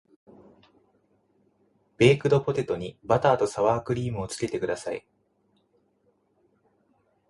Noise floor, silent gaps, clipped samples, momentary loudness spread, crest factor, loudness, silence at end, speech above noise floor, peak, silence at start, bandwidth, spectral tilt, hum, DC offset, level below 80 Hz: -69 dBFS; none; under 0.1%; 12 LU; 24 dB; -25 LUFS; 2.3 s; 45 dB; -4 dBFS; 2 s; 11.5 kHz; -6 dB/octave; none; under 0.1%; -58 dBFS